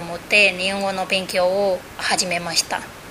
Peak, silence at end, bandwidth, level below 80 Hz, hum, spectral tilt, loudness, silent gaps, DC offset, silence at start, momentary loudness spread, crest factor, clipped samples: -4 dBFS; 0 s; 16 kHz; -52 dBFS; none; -2 dB/octave; -19 LUFS; none; under 0.1%; 0 s; 9 LU; 18 dB; under 0.1%